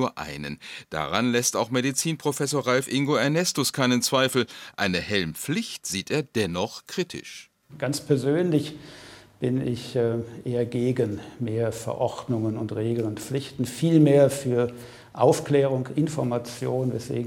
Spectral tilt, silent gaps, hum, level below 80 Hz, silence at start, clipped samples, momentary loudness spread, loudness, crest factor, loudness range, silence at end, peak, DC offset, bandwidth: -5 dB/octave; none; none; -62 dBFS; 0 s; under 0.1%; 11 LU; -25 LUFS; 20 dB; 5 LU; 0 s; -6 dBFS; under 0.1%; 16.5 kHz